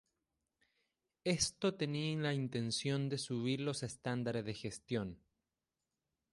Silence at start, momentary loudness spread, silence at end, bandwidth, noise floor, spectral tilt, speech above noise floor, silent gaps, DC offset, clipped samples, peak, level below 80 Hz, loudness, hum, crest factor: 1.25 s; 6 LU; 1.15 s; 11.5 kHz; under -90 dBFS; -4.5 dB/octave; over 52 dB; none; under 0.1%; under 0.1%; -20 dBFS; -68 dBFS; -38 LUFS; none; 20 dB